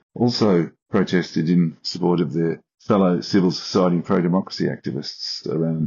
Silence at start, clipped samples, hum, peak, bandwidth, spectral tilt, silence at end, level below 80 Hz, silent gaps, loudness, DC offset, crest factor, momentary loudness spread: 0.15 s; under 0.1%; none; -6 dBFS; 7.4 kHz; -6 dB/octave; 0 s; -62 dBFS; 0.82-0.86 s; -21 LUFS; under 0.1%; 16 dB; 8 LU